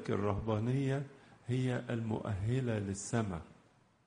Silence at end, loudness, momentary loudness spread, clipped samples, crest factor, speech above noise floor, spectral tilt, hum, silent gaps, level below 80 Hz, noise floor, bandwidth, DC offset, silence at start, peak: 0.55 s; -36 LUFS; 7 LU; under 0.1%; 18 dB; 32 dB; -6.5 dB/octave; none; none; -58 dBFS; -67 dBFS; 10 kHz; under 0.1%; 0 s; -18 dBFS